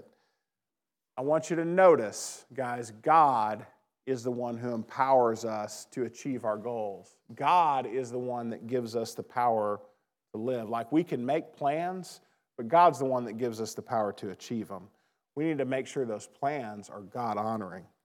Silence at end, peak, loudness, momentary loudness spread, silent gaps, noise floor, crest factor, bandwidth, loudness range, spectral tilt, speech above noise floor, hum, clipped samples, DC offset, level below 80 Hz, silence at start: 0.2 s; -10 dBFS; -30 LUFS; 18 LU; none; under -90 dBFS; 20 dB; 17 kHz; 7 LU; -5.5 dB/octave; over 61 dB; none; under 0.1%; under 0.1%; under -90 dBFS; 1.15 s